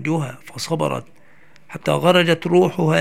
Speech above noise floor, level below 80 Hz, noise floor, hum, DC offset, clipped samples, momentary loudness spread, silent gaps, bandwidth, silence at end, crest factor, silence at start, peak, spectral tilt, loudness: 34 dB; -62 dBFS; -52 dBFS; none; 0.6%; under 0.1%; 15 LU; none; 15.5 kHz; 0 s; 20 dB; 0 s; 0 dBFS; -5.5 dB/octave; -18 LUFS